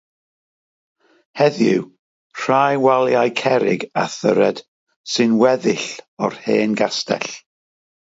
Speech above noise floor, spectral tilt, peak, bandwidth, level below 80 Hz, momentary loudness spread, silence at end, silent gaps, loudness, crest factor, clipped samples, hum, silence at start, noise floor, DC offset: over 73 dB; -5 dB/octave; -2 dBFS; 8 kHz; -68 dBFS; 14 LU; 0.8 s; 1.99-2.30 s, 4.68-4.87 s, 4.96-5.04 s, 6.08-6.17 s; -18 LUFS; 18 dB; under 0.1%; none; 1.35 s; under -90 dBFS; under 0.1%